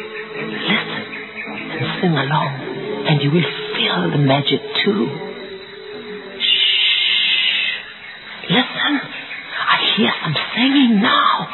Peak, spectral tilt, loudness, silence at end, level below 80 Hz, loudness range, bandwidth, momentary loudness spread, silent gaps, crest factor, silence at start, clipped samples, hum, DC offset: -2 dBFS; -7.5 dB/octave; -16 LUFS; 0 s; -62 dBFS; 4 LU; 4.3 kHz; 17 LU; none; 16 dB; 0 s; under 0.1%; none; under 0.1%